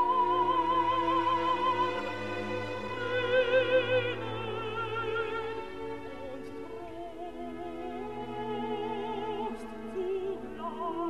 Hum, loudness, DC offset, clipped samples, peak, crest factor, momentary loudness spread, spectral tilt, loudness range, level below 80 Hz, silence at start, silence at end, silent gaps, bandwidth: none; -32 LUFS; 0.4%; under 0.1%; -16 dBFS; 16 dB; 15 LU; -6 dB/octave; 9 LU; -58 dBFS; 0 s; 0 s; none; 12 kHz